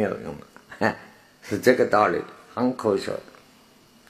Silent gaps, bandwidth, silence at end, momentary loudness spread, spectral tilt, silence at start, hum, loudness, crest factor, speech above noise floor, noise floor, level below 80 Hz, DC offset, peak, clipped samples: none; 15 kHz; 0.9 s; 20 LU; -5.5 dB/octave; 0 s; none; -24 LUFS; 24 dB; 32 dB; -55 dBFS; -62 dBFS; under 0.1%; 0 dBFS; under 0.1%